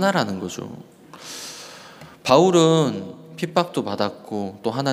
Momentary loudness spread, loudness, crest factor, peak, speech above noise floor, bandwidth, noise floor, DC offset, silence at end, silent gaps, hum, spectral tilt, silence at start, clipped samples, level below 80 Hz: 23 LU; -21 LUFS; 20 dB; -2 dBFS; 23 dB; 15.5 kHz; -43 dBFS; under 0.1%; 0 s; none; none; -5 dB/octave; 0 s; under 0.1%; -66 dBFS